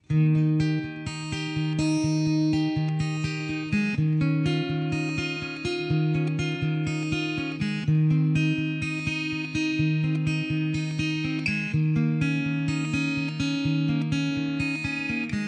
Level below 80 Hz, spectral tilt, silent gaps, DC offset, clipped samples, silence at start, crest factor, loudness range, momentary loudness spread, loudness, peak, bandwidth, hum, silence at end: -54 dBFS; -6.5 dB/octave; none; under 0.1%; under 0.1%; 0.1 s; 12 dB; 1 LU; 5 LU; -26 LUFS; -12 dBFS; 9.6 kHz; none; 0 s